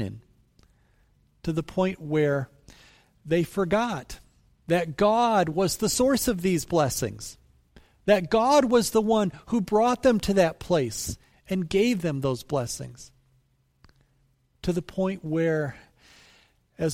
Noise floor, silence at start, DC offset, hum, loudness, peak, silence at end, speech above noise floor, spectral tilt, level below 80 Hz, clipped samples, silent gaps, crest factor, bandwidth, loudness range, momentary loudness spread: -66 dBFS; 0 s; under 0.1%; none; -25 LUFS; -8 dBFS; 0 s; 42 dB; -5 dB/octave; -50 dBFS; under 0.1%; none; 20 dB; 16.5 kHz; 8 LU; 13 LU